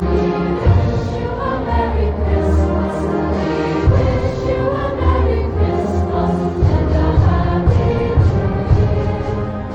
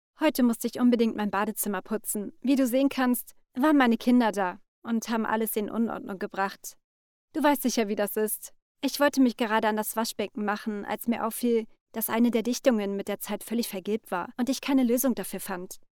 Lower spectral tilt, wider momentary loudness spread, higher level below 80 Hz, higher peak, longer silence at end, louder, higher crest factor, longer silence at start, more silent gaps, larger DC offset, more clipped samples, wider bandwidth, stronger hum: first, -9 dB/octave vs -4 dB/octave; second, 4 LU vs 10 LU; first, -22 dBFS vs -64 dBFS; first, -4 dBFS vs -8 dBFS; second, 0 s vs 0.15 s; first, -17 LUFS vs -27 LUFS; second, 12 dB vs 18 dB; second, 0 s vs 0.2 s; second, none vs 4.68-4.82 s, 6.84-7.28 s, 8.62-8.75 s, 11.81-11.86 s; neither; neither; second, 7.6 kHz vs 20 kHz; neither